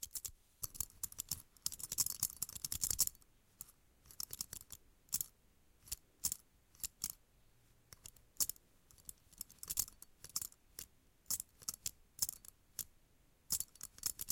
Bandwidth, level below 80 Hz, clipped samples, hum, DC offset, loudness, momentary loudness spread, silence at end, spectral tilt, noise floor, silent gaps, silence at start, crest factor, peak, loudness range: 17 kHz; -66 dBFS; under 0.1%; none; under 0.1%; -42 LUFS; 18 LU; 0 s; 0 dB/octave; -70 dBFS; none; 0 s; 30 dB; -16 dBFS; 6 LU